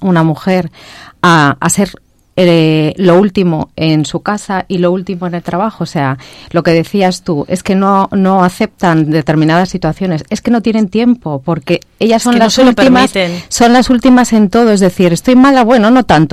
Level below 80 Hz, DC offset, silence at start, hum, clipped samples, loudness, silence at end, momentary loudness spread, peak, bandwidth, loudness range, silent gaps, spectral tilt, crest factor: -38 dBFS; under 0.1%; 0 s; none; under 0.1%; -10 LUFS; 0 s; 9 LU; 0 dBFS; 15 kHz; 6 LU; none; -5.5 dB/octave; 10 dB